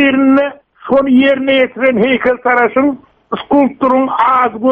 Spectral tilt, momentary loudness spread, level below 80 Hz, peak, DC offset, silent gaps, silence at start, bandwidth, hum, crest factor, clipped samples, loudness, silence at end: -7.5 dB/octave; 9 LU; -50 dBFS; -2 dBFS; under 0.1%; none; 0 s; 4.1 kHz; none; 10 dB; under 0.1%; -11 LUFS; 0 s